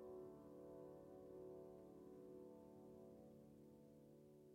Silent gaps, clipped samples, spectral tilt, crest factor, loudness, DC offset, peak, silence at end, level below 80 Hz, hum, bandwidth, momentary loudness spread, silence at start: none; under 0.1%; -8 dB/octave; 12 dB; -62 LUFS; under 0.1%; -48 dBFS; 0 s; -84 dBFS; none; 16 kHz; 8 LU; 0 s